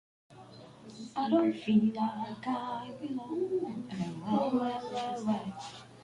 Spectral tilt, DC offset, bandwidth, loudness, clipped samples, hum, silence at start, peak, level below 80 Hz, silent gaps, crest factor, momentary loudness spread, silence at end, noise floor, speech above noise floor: -7 dB/octave; under 0.1%; 11 kHz; -33 LUFS; under 0.1%; none; 0.3 s; -16 dBFS; -70 dBFS; none; 18 dB; 19 LU; 0 s; -52 dBFS; 20 dB